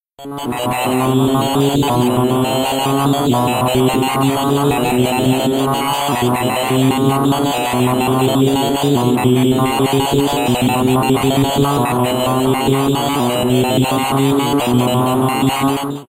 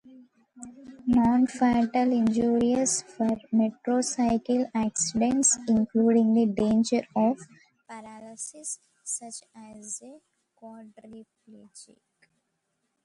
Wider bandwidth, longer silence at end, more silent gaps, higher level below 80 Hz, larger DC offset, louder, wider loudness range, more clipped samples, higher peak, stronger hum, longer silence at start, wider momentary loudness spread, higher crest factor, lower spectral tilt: first, 16 kHz vs 11.5 kHz; second, 0.05 s vs 1.2 s; neither; first, -42 dBFS vs -58 dBFS; neither; first, -15 LUFS vs -25 LUFS; second, 1 LU vs 16 LU; neither; first, -2 dBFS vs -12 dBFS; neither; second, 0.2 s vs 0.6 s; second, 2 LU vs 22 LU; about the same, 14 dB vs 16 dB; about the same, -5.5 dB/octave vs -4.5 dB/octave